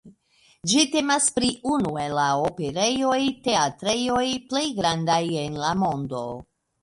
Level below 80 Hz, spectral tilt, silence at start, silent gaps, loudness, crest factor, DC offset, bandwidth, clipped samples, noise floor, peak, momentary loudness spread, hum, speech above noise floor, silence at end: -54 dBFS; -3.5 dB/octave; 0.05 s; none; -23 LUFS; 20 dB; under 0.1%; 11.5 kHz; under 0.1%; -61 dBFS; -4 dBFS; 7 LU; none; 37 dB; 0.4 s